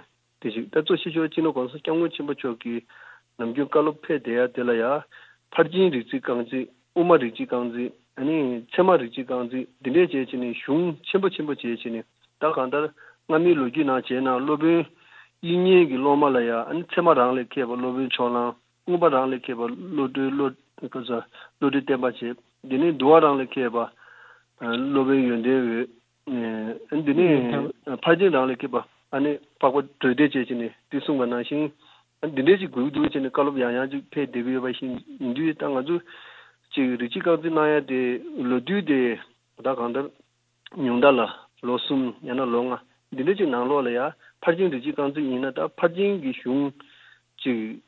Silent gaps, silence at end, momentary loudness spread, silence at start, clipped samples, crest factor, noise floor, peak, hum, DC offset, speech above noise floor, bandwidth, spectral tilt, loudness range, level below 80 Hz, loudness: none; 0.1 s; 12 LU; 0.45 s; under 0.1%; 20 dB; -55 dBFS; -4 dBFS; none; under 0.1%; 32 dB; 4.3 kHz; -8.5 dB/octave; 5 LU; -70 dBFS; -24 LUFS